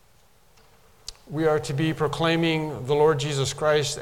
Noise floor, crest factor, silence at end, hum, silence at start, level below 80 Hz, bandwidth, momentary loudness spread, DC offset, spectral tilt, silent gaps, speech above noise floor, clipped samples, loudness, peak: -59 dBFS; 16 dB; 0 s; none; 1.1 s; -52 dBFS; 16.5 kHz; 14 LU; 0.1%; -5 dB/octave; none; 36 dB; under 0.1%; -24 LUFS; -8 dBFS